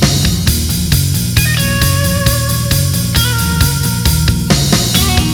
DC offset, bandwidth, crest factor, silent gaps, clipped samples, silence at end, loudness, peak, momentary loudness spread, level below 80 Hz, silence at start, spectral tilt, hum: under 0.1%; over 20 kHz; 12 dB; none; under 0.1%; 0 s; -12 LUFS; 0 dBFS; 2 LU; -20 dBFS; 0 s; -4 dB/octave; none